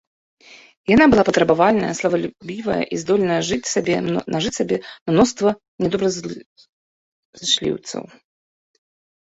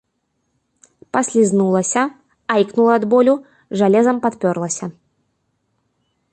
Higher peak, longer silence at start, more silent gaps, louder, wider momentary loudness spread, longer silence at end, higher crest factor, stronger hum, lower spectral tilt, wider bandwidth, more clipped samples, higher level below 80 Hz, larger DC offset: about the same, -2 dBFS vs -2 dBFS; second, 0.5 s vs 1.15 s; first, 0.77-0.84 s, 5.01-5.06 s, 5.68-5.78 s, 6.46-6.56 s, 6.69-7.33 s vs none; about the same, -19 LUFS vs -17 LUFS; first, 14 LU vs 10 LU; second, 1.25 s vs 1.4 s; about the same, 18 dB vs 16 dB; neither; about the same, -4.5 dB/octave vs -5.5 dB/octave; second, 8.2 kHz vs 11 kHz; neither; first, -50 dBFS vs -64 dBFS; neither